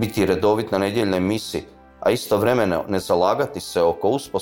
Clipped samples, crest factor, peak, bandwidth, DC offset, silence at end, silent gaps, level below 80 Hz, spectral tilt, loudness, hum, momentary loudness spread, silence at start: under 0.1%; 16 dB; -6 dBFS; 17 kHz; under 0.1%; 0 s; none; -50 dBFS; -5.5 dB/octave; -21 LUFS; none; 5 LU; 0 s